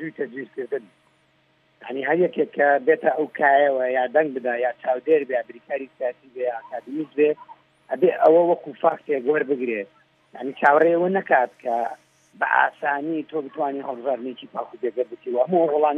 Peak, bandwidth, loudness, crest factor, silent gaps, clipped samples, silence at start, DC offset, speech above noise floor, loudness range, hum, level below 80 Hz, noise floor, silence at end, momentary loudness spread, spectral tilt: -4 dBFS; 4.2 kHz; -22 LUFS; 18 dB; none; under 0.1%; 0 s; under 0.1%; 41 dB; 5 LU; none; -82 dBFS; -63 dBFS; 0 s; 14 LU; -7.5 dB/octave